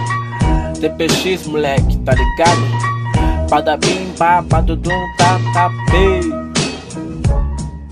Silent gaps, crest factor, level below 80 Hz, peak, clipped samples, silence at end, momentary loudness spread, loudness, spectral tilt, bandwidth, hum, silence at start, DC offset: none; 14 dB; -22 dBFS; 0 dBFS; under 0.1%; 0 s; 7 LU; -15 LUFS; -5 dB/octave; 15 kHz; none; 0 s; under 0.1%